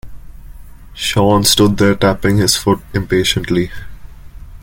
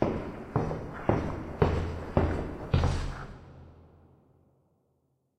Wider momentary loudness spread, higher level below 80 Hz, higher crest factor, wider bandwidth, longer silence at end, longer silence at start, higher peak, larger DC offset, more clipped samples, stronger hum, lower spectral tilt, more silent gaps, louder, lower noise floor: second, 8 LU vs 16 LU; first, -34 dBFS vs -40 dBFS; second, 16 dB vs 24 dB; first, 17 kHz vs 9.4 kHz; second, 0 s vs 1.6 s; about the same, 0.05 s vs 0 s; first, 0 dBFS vs -8 dBFS; neither; neither; neither; second, -4.5 dB/octave vs -8 dB/octave; neither; first, -13 LUFS vs -31 LUFS; second, -33 dBFS vs -74 dBFS